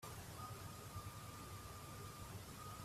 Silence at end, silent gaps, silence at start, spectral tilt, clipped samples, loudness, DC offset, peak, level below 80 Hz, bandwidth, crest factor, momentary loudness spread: 0 s; none; 0 s; -4 dB/octave; under 0.1%; -53 LUFS; under 0.1%; -38 dBFS; -64 dBFS; 15.5 kHz; 14 dB; 1 LU